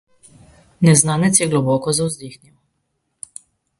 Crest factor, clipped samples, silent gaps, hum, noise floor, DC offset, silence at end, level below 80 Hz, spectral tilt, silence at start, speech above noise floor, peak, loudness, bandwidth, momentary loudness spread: 20 dB; under 0.1%; none; none; -71 dBFS; under 0.1%; 1.45 s; -54 dBFS; -4.5 dB/octave; 0.8 s; 55 dB; 0 dBFS; -16 LUFS; 11.5 kHz; 23 LU